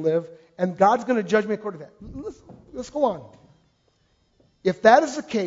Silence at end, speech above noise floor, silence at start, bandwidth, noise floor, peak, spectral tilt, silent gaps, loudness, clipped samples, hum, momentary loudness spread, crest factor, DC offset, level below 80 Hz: 0 s; 43 dB; 0 s; 7.8 kHz; -65 dBFS; -2 dBFS; -5.5 dB/octave; none; -22 LUFS; under 0.1%; none; 22 LU; 22 dB; under 0.1%; -56 dBFS